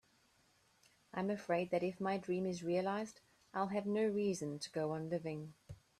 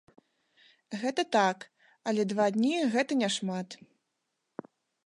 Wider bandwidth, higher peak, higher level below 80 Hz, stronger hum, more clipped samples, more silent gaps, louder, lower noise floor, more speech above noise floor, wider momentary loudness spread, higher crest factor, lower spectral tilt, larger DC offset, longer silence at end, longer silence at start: first, 13 kHz vs 11.5 kHz; second, -22 dBFS vs -12 dBFS; first, -76 dBFS vs -82 dBFS; neither; neither; neither; second, -39 LUFS vs -29 LUFS; second, -73 dBFS vs -82 dBFS; second, 35 dB vs 53 dB; second, 11 LU vs 20 LU; about the same, 18 dB vs 20 dB; first, -6 dB/octave vs -4.5 dB/octave; neither; second, 0.25 s vs 1.3 s; first, 1.15 s vs 0.9 s